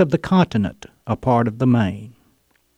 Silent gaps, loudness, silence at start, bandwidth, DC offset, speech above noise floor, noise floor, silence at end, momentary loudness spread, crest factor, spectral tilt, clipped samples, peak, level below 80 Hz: none; -19 LUFS; 0 s; 9.8 kHz; under 0.1%; 44 dB; -62 dBFS; 0.65 s; 11 LU; 16 dB; -8 dB/octave; under 0.1%; -4 dBFS; -48 dBFS